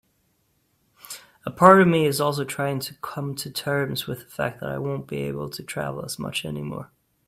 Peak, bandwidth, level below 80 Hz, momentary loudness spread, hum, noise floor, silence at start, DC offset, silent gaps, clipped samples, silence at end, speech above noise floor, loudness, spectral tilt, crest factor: 0 dBFS; 16 kHz; -58 dBFS; 19 LU; none; -68 dBFS; 1.05 s; under 0.1%; none; under 0.1%; 0.45 s; 45 dB; -23 LUFS; -5.5 dB/octave; 24 dB